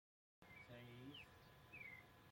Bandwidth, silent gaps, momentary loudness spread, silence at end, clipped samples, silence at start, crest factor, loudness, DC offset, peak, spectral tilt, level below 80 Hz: 16.5 kHz; none; 7 LU; 0 s; under 0.1%; 0.4 s; 16 dB; -60 LUFS; under 0.1%; -46 dBFS; -5 dB/octave; -80 dBFS